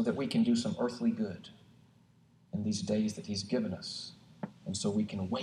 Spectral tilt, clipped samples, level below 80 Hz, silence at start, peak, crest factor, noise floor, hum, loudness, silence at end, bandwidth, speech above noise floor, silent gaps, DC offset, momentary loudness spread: -5.5 dB/octave; under 0.1%; -70 dBFS; 0 s; -18 dBFS; 16 dB; -64 dBFS; none; -34 LUFS; 0 s; 11 kHz; 31 dB; none; under 0.1%; 15 LU